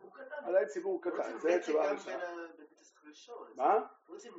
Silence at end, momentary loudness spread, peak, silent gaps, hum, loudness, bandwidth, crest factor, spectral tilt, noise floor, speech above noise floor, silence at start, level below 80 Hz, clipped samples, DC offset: 0 s; 19 LU; -16 dBFS; none; none; -34 LUFS; 7.6 kHz; 20 dB; -2.5 dB/octave; -59 dBFS; 25 dB; 0.05 s; under -90 dBFS; under 0.1%; under 0.1%